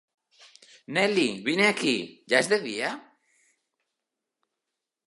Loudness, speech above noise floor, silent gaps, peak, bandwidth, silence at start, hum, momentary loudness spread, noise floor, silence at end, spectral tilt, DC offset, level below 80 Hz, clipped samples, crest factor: -25 LUFS; 60 dB; none; -4 dBFS; 11.5 kHz; 0.9 s; none; 9 LU; -86 dBFS; 2.05 s; -3.5 dB/octave; under 0.1%; -78 dBFS; under 0.1%; 26 dB